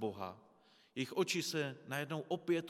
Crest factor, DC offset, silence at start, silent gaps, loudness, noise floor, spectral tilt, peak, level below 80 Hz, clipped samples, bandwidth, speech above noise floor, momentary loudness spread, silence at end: 18 dB; under 0.1%; 0 s; none; -40 LUFS; -68 dBFS; -4.5 dB/octave; -22 dBFS; -90 dBFS; under 0.1%; 16.5 kHz; 30 dB; 13 LU; 0 s